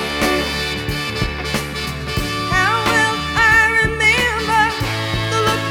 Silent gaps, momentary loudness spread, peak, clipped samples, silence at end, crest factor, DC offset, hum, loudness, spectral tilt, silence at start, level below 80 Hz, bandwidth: none; 10 LU; -2 dBFS; under 0.1%; 0 s; 16 dB; under 0.1%; none; -16 LUFS; -3.5 dB/octave; 0 s; -32 dBFS; 17.5 kHz